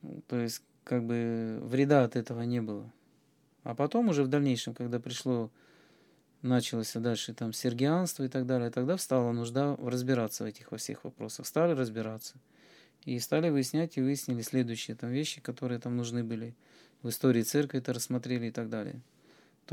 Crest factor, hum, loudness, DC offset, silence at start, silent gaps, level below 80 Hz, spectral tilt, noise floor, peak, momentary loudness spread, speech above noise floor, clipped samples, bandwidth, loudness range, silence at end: 22 dB; none; -32 LUFS; under 0.1%; 0.05 s; none; -86 dBFS; -5.5 dB/octave; -68 dBFS; -10 dBFS; 12 LU; 36 dB; under 0.1%; 18 kHz; 3 LU; 0 s